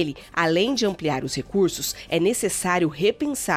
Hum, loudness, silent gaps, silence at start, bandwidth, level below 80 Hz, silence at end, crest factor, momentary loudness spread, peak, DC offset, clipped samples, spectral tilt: none; -23 LUFS; none; 0 s; 18 kHz; -52 dBFS; 0 s; 16 dB; 6 LU; -8 dBFS; under 0.1%; under 0.1%; -4 dB/octave